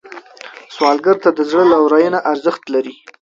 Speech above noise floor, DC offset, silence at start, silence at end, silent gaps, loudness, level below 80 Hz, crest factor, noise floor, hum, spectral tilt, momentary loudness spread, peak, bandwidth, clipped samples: 23 dB; under 0.1%; 0.05 s; 0.35 s; none; -14 LUFS; -62 dBFS; 14 dB; -37 dBFS; none; -5.5 dB/octave; 21 LU; 0 dBFS; 7.6 kHz; under 0.1%